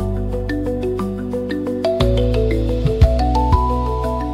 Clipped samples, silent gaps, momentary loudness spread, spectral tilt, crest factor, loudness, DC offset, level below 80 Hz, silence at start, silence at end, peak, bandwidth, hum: under 0.1%; none; 7 LU; -8 dB/octave; 16 dB; -19 LUFS; under 0.1%; -22 dBFS; 0 s; 0 s; -2 dBFS; 12 kHz; none